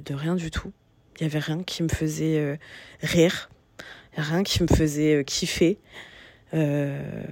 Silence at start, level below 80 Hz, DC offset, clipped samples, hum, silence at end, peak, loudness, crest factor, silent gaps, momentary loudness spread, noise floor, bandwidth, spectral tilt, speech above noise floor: 0 s; -42 dBFS; under 0.1%; under 0.1%; none; 0 s; -6 dBFS; -25 LUFS; 20 dB; none; 22 LU; -46 dBFS; 16.5 kHz; -5.5 dB/octave; 21 dB